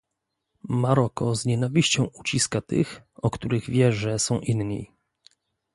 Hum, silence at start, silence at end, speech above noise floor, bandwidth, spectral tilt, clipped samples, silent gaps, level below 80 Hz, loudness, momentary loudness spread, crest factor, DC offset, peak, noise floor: none; 0.65 s; 0.9 s; 57 dB; 11.5 kHz; -5 dB/octave; under 0.1%; none; -52 dBFS; -24 LUFS; 8 LU; 20 dB; under 0.1%; -6 dBFS; -81 dBFS